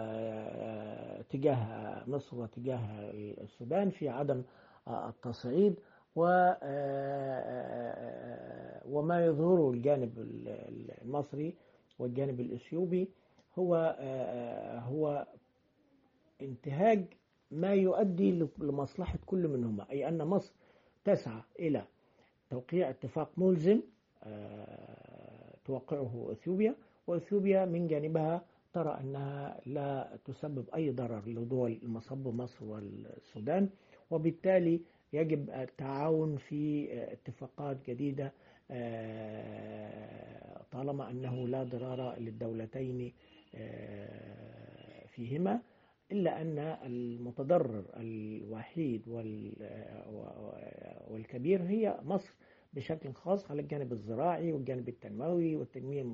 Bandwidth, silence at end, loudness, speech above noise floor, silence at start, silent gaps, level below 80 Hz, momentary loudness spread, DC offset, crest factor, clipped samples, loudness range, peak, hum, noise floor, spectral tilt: 7.4 kHz; 0 s; -36 LUFS; 37 dB; 0 s; none; -66 dBFS; 17 LU; under 0.1%; 20 dB; under 0.1%; 8 LU; -16 dBFS; none; -72 dBFS; -8 dB/octave